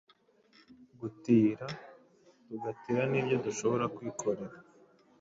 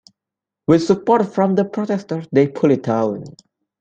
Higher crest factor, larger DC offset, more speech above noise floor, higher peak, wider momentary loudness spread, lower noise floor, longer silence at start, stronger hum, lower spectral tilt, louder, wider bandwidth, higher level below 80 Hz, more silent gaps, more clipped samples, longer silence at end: about the same, 20 dB vs 16 dB; neither; second, 34 dB vs 69 dB; second, -14 dBFS vs -2 dBFS; first, 18 LU vs 8 LU; second, -66 dBFS vs -86 dBFS; about the same, 0.7 s vs 0.7 s; neither; second, -6 dB/octave vs -7.5 dB/octave; second, -32 LUFS vs -18 LUFS; second, 7.8 kHz vs 8.8 kHz; second, -72 dBFS vs -58 dBFS; neither; neither; about the same, 0.6 s vs 0.5 s